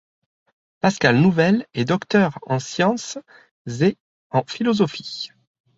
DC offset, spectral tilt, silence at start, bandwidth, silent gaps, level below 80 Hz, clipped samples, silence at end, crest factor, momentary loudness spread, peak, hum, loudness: under 0.1%; -6 dB/octave; 0.85 s; 8 kHz; 3.51-3.65 s, 4.00-4.30 s; -58 dBFS; under 0.1%; 0.5 s; 20 dB; 17 LU; -2 dBFS; none; -20 LUFS